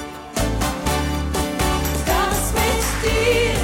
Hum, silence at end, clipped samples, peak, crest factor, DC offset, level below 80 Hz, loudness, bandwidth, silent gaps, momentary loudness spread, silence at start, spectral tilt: none; 0 s; under 0.1%; -6 dBFS; 14 dB; 0.2%; -26 dBFS; -20 LUFS; 16.5 kHz; none; 5 LU; 0 s; -4 dB/octave